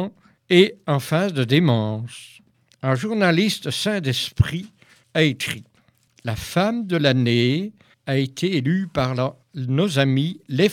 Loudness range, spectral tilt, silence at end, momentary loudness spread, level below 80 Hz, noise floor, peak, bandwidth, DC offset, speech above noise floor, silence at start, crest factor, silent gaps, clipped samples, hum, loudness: 2 LU; -6 dB/octave; 0 s; 13 LU; -46 dBFS; -59 dBFS; 0 dBFS; 16.5 kHz; under 0.1%; 38 dB; 0 s; 20 dB; none; under 0.1%; none; -21 LUFS